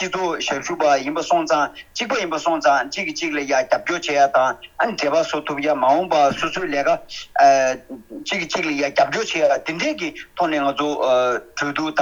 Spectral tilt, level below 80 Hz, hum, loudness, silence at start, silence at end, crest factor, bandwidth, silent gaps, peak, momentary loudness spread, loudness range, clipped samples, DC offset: -3 dB/octave; -56 dBFS; none; -20 LUFS; 0 s; 0 s; 16 dB; 20 kHz; none; -2 dBFS; 8 LU; 2 LU; under 0.1%; under 0.1%